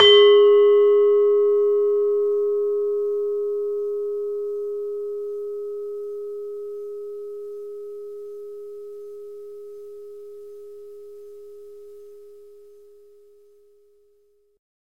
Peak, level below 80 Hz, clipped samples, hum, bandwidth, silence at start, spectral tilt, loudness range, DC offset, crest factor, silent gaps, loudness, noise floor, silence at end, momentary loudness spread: -2 dBFS; -70 dBFS; under 0.1%; none; 6 kHz; 0 s; -3.5 dB/octave; 23 LU; 0.3%; 20 dB; none; -20 LUFS; -62 dBFS; 2.55 s; 26 LU